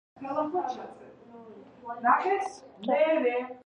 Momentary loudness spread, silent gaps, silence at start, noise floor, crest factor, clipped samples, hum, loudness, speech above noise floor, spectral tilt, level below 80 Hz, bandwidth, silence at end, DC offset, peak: 21 LU; none; 0.2 s; -49 dBFS; 22 dB; under 0.1%; none; -28 LUFS; 21 dB; -5 dB/octave; -76 dBFS; 10 kHz; 0.1 s; under 0.1%; -8 dBFS